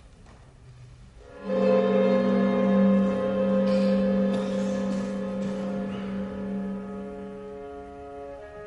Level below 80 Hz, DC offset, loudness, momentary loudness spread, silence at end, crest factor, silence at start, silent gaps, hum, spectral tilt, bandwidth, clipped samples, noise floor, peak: -54 dBFS; under 0.1%; -25 LUFS; 18 LU; 0 s; 14 dB; 0.05 s; none; none; -8 dB/octave; 8.2 kHz; under 0.1%; -50 dBFS; -12 dBFS